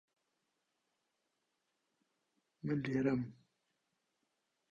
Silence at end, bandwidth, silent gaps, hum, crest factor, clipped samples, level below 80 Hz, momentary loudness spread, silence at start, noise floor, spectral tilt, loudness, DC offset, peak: 1.35 s; 7.4 kHz; none; none; 22 dB; under 0.1%; -76 dBFS; 12 LU; 2.65 s; -85 dBFS; -8.5 dB/octave; -38 LUFS; under 0.1%; -22 dBFS